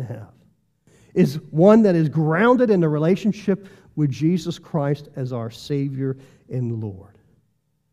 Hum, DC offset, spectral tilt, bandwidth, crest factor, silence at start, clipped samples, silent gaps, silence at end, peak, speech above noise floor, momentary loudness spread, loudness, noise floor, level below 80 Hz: none; under 0.1%; -8 dB/octave; 13.5 kHz; 20 dB; 0 s; under 0.1%; none; 0.9 s; -2 dBFS; 49 dB; 15 LU; -20 LUFS; -68 dBFS; -60 dBFS